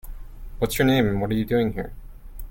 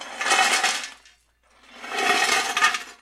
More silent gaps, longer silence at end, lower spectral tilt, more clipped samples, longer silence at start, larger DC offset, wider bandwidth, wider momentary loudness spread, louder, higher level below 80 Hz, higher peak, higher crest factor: neither; about the same, 0 s vs 0.05 s; first, -6 dB/octave vs 1 dB/octave; neither; about the same, 0.05 s vs 0 s; neither; about the same, 17 kHz vs 16.5 kHz; first, 24 LU vs 13 LU; about the same, -23 LUFS vs -21 LUFS; first, -36 dBFS vs -68 dBFS; about the same, -6 dBFS vs -4 dBFS; about the same, 18 dB vs 22 dB